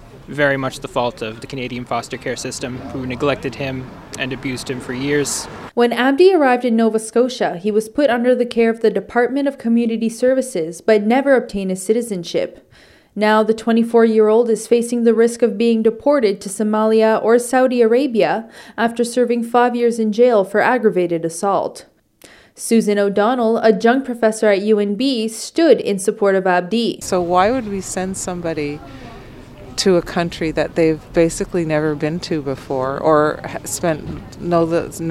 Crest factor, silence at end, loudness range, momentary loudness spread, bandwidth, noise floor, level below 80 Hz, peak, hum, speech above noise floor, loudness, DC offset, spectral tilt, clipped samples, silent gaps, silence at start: 16 dB; 0 s; 6 LU; 11 LU; 15 kHz; -47 dBFS; -46 dBFS; 0 dBFS; none; 30 dB; -17 LUFS; under 0.1%; -5 dB/octave; under 0.1%; none; 0 s